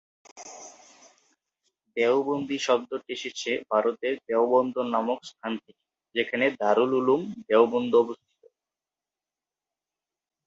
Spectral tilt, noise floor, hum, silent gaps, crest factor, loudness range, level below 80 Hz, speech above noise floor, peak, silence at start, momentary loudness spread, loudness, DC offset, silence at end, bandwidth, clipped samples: -4.5 dB/octave; under -90 dBFS; none; none; 22 dB; 4 LU; -76 dBFS; over 65 dB; -6 dBFS; 0.35 s; 15 LU; -26 LUFS; under 0.1%; 2.3 s; 7.8 kHz; under 0.1%